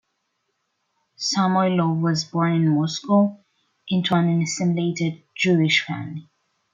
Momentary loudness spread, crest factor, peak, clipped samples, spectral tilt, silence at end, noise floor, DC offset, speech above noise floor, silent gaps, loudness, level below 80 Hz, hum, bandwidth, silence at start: 8 LU; 16 dB; -6 dBFS; under 0.1%; -5.5 dB/octave; 0.5 s; -74 dBFS; under 0.1%; 53 dB; none; -21 LUFS; -68 dBFS; none; 7.6 kHz; 1.2 s